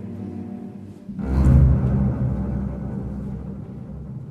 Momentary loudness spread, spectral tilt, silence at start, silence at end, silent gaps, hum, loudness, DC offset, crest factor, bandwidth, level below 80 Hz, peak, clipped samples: 19 LU; -10.5 dB/octave; 0 s; 0 s; none; none; -22 LUFS; under 0.1%; 20 dB; 4.4 kHz; -26 dBFS; -2 dBFS; under 0.1%